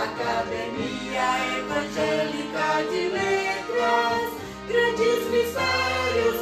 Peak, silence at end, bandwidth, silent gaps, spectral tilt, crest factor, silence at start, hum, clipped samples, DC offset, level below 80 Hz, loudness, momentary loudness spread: -10 dBFS; 0 s; 14 kHz; none; -4 dB/octave; 16 dB; 0 s; none; under 0.1%; under 0.1%; -54 dBFS; -24 LUFS; 6 LU